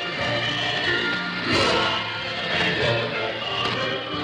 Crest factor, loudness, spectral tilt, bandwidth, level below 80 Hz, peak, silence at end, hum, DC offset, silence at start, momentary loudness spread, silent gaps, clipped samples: 16 dB; -22 LUFS; -4 dB/octave; 12 kHz; -52 dBFS; -8 dBFS; 0 s; none; under 0.1%; 0 s; 6 LU; none; under 0.1%